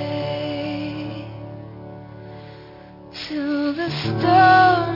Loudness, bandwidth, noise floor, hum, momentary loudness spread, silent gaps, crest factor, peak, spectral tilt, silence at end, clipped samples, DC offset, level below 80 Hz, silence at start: -19 LUFS; 5.8 kHz; -42 dBFS; none; 26 LU; none; 18 dB; -2 dBFS; -7 dB/octave; 0 s; under 0.1%; under 0.1%; -54 dBFS; 0 s